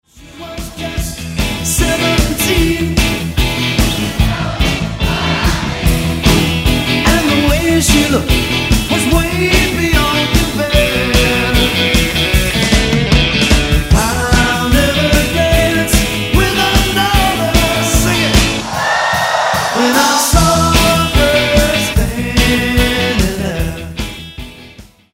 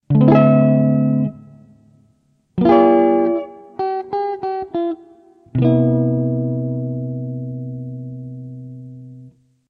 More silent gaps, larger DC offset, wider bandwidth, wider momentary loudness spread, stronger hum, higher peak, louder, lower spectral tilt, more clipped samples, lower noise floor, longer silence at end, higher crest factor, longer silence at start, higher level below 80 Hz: neither; neither; first, 16.5 kHz vs 4.9 kHz; second, 6 LU vs 21 LU; neither; about the same, 0 dBFS vs 0 dBFS; first, -12 LUFS vs -17 LUFS; second, -4 dB/octave vs -11.5 dB/octave; neither; second, -38 dBFS vs -60 dBFS; about the same, 0.3 s vs 0.4 s; second, 12 dB vs 18 dB; about the same, 0.15 s vs 0.1 s; first, -20 dBFS vs -52 dBFS